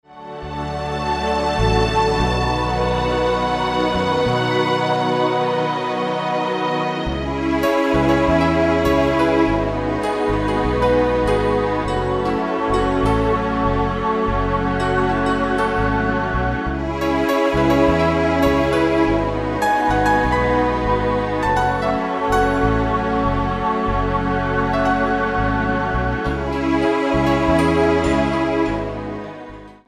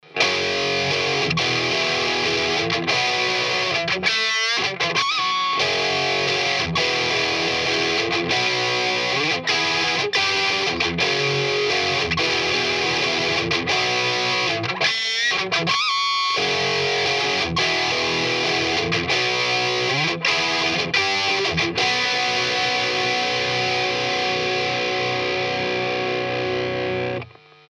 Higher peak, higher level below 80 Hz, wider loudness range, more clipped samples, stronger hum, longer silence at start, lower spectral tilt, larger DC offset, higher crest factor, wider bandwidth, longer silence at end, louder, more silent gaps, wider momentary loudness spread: about the same, -4 dBFS vs -4 dBFS; first, -30 dBFS vs -52 dBFS; about the same, 2 LU vs 1 LU; neither; neither; about the same, 0.1 s vs 0.1 s; first, -6.5 dB/octave vs -2.5 dB/octave; neither; about the same, 14 dB vs 18 dB; about the same, 13.5 kHz vs 14.5 kHz; second, 0.15 s vs 0.4 s; about the same, -19 LUFS vs -20 LUFS; neither; about the same, 5 LU vs 3 LU